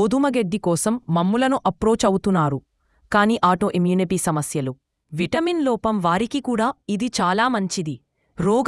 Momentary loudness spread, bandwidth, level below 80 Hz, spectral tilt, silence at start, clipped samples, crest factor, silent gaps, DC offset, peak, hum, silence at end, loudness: 7 LU; 12 kHz; -50 dBFS; -5.5 dB/octave; 0 s; under 0.1%; 18 dB; none; under 0.1%; -4 dBFS; none; 0 s; -21 LUFS